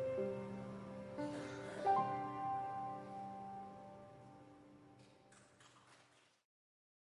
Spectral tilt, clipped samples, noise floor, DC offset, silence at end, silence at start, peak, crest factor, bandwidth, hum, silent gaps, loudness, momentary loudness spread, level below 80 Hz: -6.5 dB/octave; under 0.1%; -71 dBFS; under 0.1%; 1.15 s; 0 s; -24 dBFS; 22 dB; 11.5 kHz; none; none; -44 LUFS; 27 LU; -76 dBFS